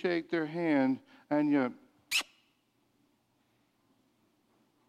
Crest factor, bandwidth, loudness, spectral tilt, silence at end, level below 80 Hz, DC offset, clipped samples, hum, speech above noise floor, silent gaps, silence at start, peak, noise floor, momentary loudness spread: 18 dB; 15.5 kHz; -31 LUFS; -4.5 dB/octave; 2.65 s; -84 dBFS; under 0.1%; under 0.1%; none; 44 dB; none; 0 s; -16 dBFS; -74 dBFS; 8 LU